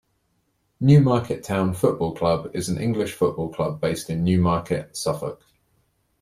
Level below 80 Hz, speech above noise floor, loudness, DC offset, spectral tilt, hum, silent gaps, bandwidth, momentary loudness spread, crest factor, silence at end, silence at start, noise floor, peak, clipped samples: -52 dBFS; 48 dB; -22 LUFS; under 0.1%; -7 dB/octave; none; none; 14.5 kHz; 10 LU; 18 dB; 0.85 s; 0.8 s; -69 dBFS; -4 dBFS; under 0.1%